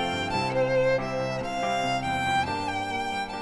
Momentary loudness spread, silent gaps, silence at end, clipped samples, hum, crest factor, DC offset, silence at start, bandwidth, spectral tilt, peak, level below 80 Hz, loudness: 5 LU; none; 0 s; under 0.1%; none; 12 dB; under 0.1%; 0 s; 12 kHz; -4.5 dB/octave; -14 dBFS; -50 dBFS; -27 LUFS